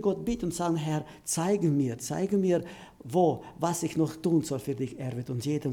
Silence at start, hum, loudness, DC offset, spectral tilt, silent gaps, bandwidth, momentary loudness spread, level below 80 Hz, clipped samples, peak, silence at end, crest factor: 0 s; none; -29 LUFS; under 0.1%; -6 dB/octave; none; 18 kHz; 8 LU; -56 dBFS; under 0.1%; -12 dBFS; 0 s; 16 dB